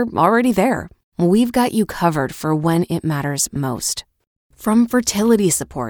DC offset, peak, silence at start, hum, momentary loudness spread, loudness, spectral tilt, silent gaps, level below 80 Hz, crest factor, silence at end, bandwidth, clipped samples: under 0.1%; -2 dBFS; 0 s; none; 7 LU; -18 LUFS; -5 dB/octave; 1.04-1.12 s, 4.27-4.50 s; -48 dBFS; 16 dB; 0 s; over 20 kHz; under 0.1%